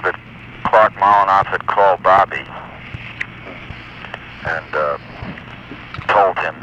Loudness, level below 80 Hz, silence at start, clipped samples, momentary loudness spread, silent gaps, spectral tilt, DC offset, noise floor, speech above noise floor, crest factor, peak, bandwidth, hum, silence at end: -16 LUFS; -46 dBFS; 0 s; under 0.1%; 20 LU; none; -6 dB/octave; under 0.1%; -36 dBFS; 21 dB; 18 dB; 0 dBFS; 8.8 kHz; none; 0 s